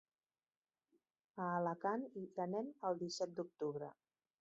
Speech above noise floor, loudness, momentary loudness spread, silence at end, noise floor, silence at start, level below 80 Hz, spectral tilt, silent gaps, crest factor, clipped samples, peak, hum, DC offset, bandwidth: over 47 dB; -43 LUFS; 8 LU; 0.5 s; under -90 dBFS; 1.35 s; -90 dBFS; -5 dB/octave; none; 18 dB; under 0.1%; -26 dBFS; none; under 0.1%; 7.4 kHz